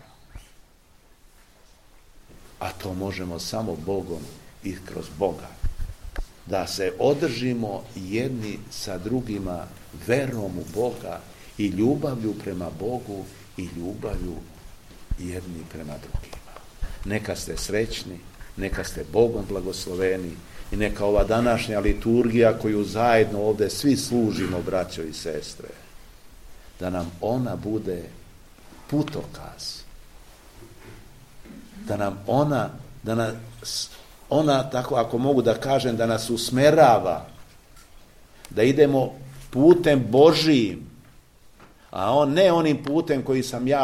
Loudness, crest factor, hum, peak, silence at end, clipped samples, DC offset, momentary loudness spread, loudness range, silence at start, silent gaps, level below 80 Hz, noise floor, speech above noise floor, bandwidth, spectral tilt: -24 LUFS; 22 dB; none; -4 dBFS; 0 s; under 0.1%; 0.1%; 19 LU; 13 LU; 0.35 s; none; -40 dBFS; -55 dBFS; 31 dB; 16 kHz; -5.5 dB/octave